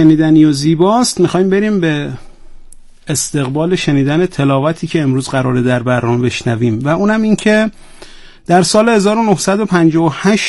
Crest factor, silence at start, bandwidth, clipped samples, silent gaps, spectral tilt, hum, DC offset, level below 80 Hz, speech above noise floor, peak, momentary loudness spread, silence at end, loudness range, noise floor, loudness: 12 dB; 0 s; 12 kHz; under 0.1%; none; -5.5 dB/octave; none; under 0.1%; -40 dBFS; 22 dB; 0 dBFS; 6 LU; 0 s; 3 LU; -34 dBFS; -12 LUFS